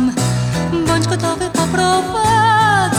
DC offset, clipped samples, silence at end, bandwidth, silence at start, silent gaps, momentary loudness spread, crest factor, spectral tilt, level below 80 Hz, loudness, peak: under 0.1%; under 0.1%; 0 s; 18 kHz; 0 s; none; 6 LU; 12 dB; -4.5 dB/octave; -38 dBFS; -15 LUFS; -2 dBFS